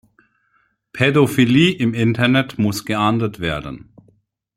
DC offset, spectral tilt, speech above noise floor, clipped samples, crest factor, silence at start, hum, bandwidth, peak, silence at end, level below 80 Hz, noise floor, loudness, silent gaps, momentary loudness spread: under 0.1%; -6 dB/octave; 47 dB; under 0.1%; 18 dB; 0.95 s; none; 16.5 kHz; -2 dBFS; 0.8 s; -48 dBFS; -63 dBFS; -17 LUFS; none; 13 LU